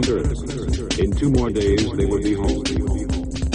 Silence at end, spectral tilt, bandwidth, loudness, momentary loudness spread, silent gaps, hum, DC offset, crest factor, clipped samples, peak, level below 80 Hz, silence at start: 0 s; -6 dB/octave; 10 kHz; -21 LUFS; 6 LU; none; none; 0.2%; 14 dB; under 0.1%; -6 dBFS; -26 dBFS; 0 s